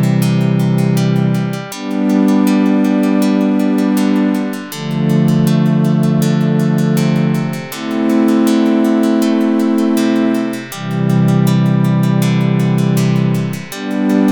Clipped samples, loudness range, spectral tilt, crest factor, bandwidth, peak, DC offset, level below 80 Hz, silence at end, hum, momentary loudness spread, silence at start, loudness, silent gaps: under 0.1%; 0 LU; -7 dB/octave; 10 dB; 19 kHz; -2 dBFS; under 0.1%; -56 dBFS; 0 s; none; 8 LU; 0 s; -14 LUFS; none